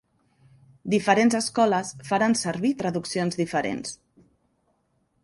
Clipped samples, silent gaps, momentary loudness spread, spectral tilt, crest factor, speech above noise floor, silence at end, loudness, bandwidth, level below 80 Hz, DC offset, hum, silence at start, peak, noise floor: under 0.1%; none; 12 LU; -4.5 dB/octave; 20 dB; 46 dB; 1.3 s; -24 LUFS; 11.5 kHz; -64 dBFS; under 0.1%; none; 0.85 s; -6 dBFS; -70 dBFS